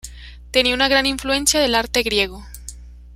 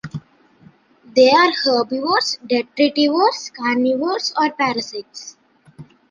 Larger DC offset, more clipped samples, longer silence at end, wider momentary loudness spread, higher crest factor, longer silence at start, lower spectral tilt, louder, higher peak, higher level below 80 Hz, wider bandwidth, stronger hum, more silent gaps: neither; neither; second, 0 s vs 0.3 s; about the same, 21 LU vs 19 LU; about the same, 18 dB vs 18 dB; about the same, 0.05 s vs 0.05 s; second, -1.5 dB/octave vs -3.5 dB/octave; about the same, -17 LUFS vs -17 LUFS; about the same, -2 dBFS vs -2 dBFS; first, -38 dBFS vs -64 dBFS; first, 16 kHz vs 9.4 kHz; first, 60 Hz at -35 dBFS vs none; neither